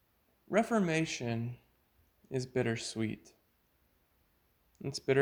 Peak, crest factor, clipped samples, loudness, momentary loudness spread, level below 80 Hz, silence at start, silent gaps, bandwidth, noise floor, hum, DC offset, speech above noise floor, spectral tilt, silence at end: -14 dBFS; 22 dB; under 0.1%; -35 LUFS; 13 LU; -68 dBFS; 0.5 s; none; over 20 kHz; -73 dBFS; none; under 0.1%; 40 dB; -5.5 dB/octave; 0 s